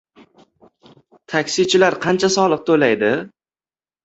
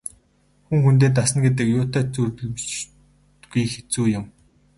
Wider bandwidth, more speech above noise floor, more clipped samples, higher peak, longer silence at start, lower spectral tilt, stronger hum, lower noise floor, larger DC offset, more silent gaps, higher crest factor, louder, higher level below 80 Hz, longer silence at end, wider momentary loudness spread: second, 8 kHz vs 11.5 kHz; first, over 74 dB vs 41 dB; neither; first, -2 dBFS vs -6 dBFS; first, 1.3 s vs 0.7 s; second, -4 dB/octave vs -5.5 dB/octave; neither; first, under -90 dBFS vs -60 dBFS; neither; neither; about the same, 18 dB vs 16 dB; first, -17 LUFS vs -21 LUFS; second, -60 dBFS vs -50 dBFS; first, 0.75 s vs 0.5 s; second, 8 LU vs 13 LU